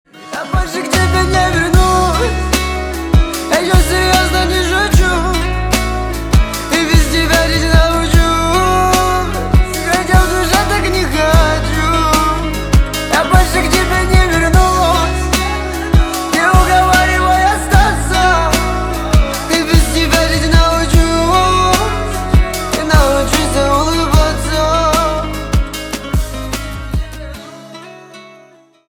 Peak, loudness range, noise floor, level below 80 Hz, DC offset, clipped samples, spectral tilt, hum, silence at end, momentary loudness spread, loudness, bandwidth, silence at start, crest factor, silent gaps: 0 dBFS; 2 LU; -45 dBFS; -18 dBFS; under 0.1%; under 0.1%; -4.5 dB/octave; none; 0.6 s; 8 LU; -13 LUFS; 19.5 kHz; 0.15 s; 12 dB; none